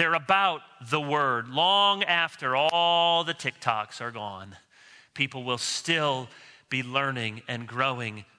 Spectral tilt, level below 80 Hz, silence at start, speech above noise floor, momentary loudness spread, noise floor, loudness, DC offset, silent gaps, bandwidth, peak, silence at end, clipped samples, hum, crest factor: -3 dB/octave; -76 dBFS; 0 s; 28 dB; 13 LU; -55 dBFS; -26 LUFS; under 0.1%; none; 11 kHz; -8 dBFS; 0.15 s; under 0.1%; none; 20 dB